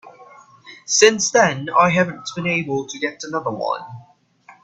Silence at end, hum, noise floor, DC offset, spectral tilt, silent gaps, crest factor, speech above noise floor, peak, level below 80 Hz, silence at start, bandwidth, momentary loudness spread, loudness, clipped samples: 0.15 s; none; -50 dBFS; under 0.1%; -3 dB/octave; none; 20 dB; 31 dB; 0 dBFS; -60 dBFS; 0.05 s; 9.8 kHz; 12 LU; -18 LUFS; under 0.1%